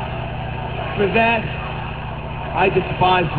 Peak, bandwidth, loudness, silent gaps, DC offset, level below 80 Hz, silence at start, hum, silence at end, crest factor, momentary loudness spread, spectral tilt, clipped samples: -4 dBFS; 4.9 kHz; -20 LUFS; none; 0.6%; -34 dBFS; 0 s; 60 Hz at -30 dBFS; 0 s; 16 dB; 12 LU; -9.5 dB/octave; under 0.1%